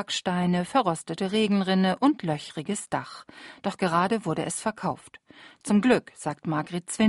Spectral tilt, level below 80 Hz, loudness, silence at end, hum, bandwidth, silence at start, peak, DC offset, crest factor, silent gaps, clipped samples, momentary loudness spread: -5 dB/octave; -64 dBFS; -26 LUFS; 0 s; none; 11.5 kHz; 0 s; -10 dBFS; under 0.1%; 18 dB; none; under 0.1%; 11 LU